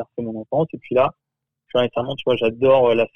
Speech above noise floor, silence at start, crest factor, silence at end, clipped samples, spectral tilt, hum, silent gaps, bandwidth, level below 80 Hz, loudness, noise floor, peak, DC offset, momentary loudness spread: 38 dB; 0 s; 16 dB; 0.1 s; under 0.1%; -8 dB/octave; none; none; 5.6 kHz; -58 dBFS; -20 LUFS; -57 dBFS; -4 dBFS; under 0.1%; 9 LU